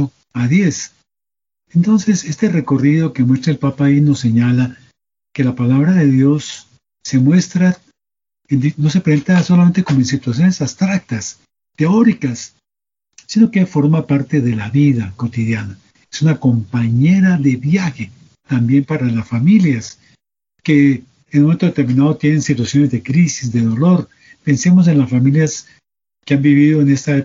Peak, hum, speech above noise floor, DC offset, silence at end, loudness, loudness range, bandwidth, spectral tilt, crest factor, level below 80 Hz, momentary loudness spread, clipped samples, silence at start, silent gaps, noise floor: -2 dBFS; none; 77 dB; under 0.1%; 0 s; -14 LUFS; 2 LU; 7.6 kHz; -7 dB/octave; 14 dB; -54 dBFS; 11 LU; under 0.1%; 0 s; none; -90 dBFS